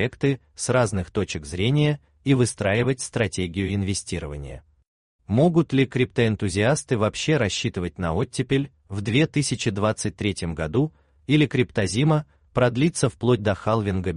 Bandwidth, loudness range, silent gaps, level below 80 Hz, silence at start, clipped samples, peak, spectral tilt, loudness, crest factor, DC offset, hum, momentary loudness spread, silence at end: 11 kHz; 2 LU; 4.88-5.19 s; -48 dBFS; 0 s; under 0.1%; -6 dBFS; -5.5 dB/octave; -23 LUFS; 16 dB; under 0.1%; none; 7 LU; 0 s